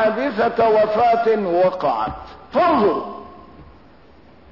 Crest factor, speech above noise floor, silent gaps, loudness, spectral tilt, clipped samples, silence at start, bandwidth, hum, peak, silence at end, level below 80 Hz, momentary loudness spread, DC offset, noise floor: 12 dB; 31 dB; none; -18 LUFS; -7.5 dB/octave; under 0.1%; 0 s; 6 kHz; none; -8 dBFS; 0.9 s; -50 dBFS; 11 LU; 0.3%; -48 dBFS